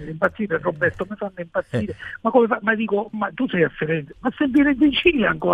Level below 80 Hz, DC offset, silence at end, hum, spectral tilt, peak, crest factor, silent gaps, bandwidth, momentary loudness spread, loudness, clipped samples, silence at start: -48 dBFS; under 0.1%; 0 s; none; -7.5 dB/octave; -2 dBFS; 18 dB; none; 7.6 kHz; 11 LU; -21 LUFS; under 0.1%; 0 s